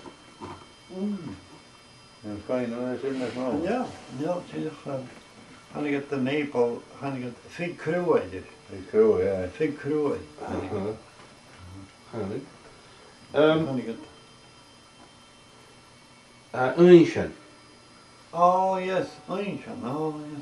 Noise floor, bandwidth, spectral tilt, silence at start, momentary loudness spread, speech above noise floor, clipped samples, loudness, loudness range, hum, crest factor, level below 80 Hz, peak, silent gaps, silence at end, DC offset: -53 dBFS; 11.5 kHz; -7 dB/octave; 0 s; 21 LU; 27 dB; under 0.1%; -26 LUFS; 10 LU; none; 24 dB; -64 dBFS; -2 dBFS; none; 0 s; under 0.1%